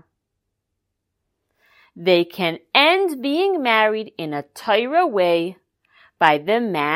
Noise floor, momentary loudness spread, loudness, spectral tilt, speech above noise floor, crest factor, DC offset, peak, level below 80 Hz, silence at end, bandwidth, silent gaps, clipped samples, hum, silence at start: -78 dBFS; 12 LU; -19 LUFS; -5 dB/octave; 59 dB; 20 dB; under 0.1%; 0 dBFS; -76 dBFS; 0 s; 16 kHz; none; under 0.1%; none; 1.95 s